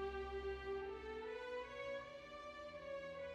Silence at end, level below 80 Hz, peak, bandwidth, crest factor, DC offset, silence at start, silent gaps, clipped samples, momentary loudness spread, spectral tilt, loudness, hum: 0 s; -62 dBFS; -34 dBFS; 10 kHz; 14 dB; under 0.1%; 0 s; none; under 0.1%; 6 LU; -5.5 dB/octave; -48 LUFS; none